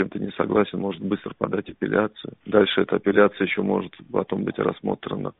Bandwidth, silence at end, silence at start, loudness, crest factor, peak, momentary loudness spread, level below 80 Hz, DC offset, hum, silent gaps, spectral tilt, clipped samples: 4.1 kHz; 0.1 s; 0 s; -24 LUFS; 20 dB; -2 dBFS; 9 LU; -58 dBFS; under 0.1%; none; none; -4.5 dB/octave; under 0.1%